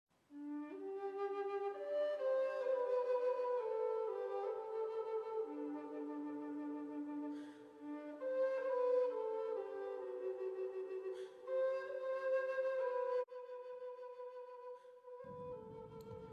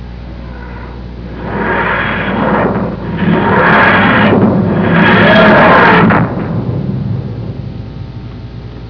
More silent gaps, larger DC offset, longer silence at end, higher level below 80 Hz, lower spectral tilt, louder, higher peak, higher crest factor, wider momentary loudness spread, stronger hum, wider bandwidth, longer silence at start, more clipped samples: neither; second, under 0.1% vs 0.5%; about the same, 0 s vs 0 s; second, -82 dBFS vs -30 dBFS; second, -6.5 dB/octave vs -8.5 dB/octave; second, -42 LUFS vs -9 LUFS; second, -28 dBFS vs 0 dBFS; about the same, 14 dB vs 10 dB; second, 14 LU vs 21 LU; second, none vs 60 Hz at -30 dBFS; first, 6.4 kHz vs 5.4 kHz; first, 0.3 s vs 0 s; neither